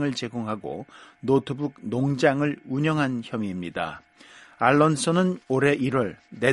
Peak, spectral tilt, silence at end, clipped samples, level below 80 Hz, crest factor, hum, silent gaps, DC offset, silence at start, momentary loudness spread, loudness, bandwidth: -4 dBFS; -6 dB/octave; 0 s; under 0.1%; -60 dBFS; 22 dB; none; none; under 0.1%; 0 s; 12 LU; -25 LUFS; 11.5 kHz